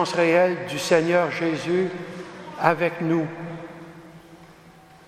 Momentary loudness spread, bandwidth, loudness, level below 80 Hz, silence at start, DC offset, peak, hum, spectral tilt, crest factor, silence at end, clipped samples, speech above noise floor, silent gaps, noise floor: 19 LU; 14.5 kHz; -22 LUFS; -66 dBFS; 0 s; under 0.1%; 0 dBFS; none; -5.5 dB/octave; 24 dB; 0.35 s; under 0.1%; 27 dB; none; -49 dBFS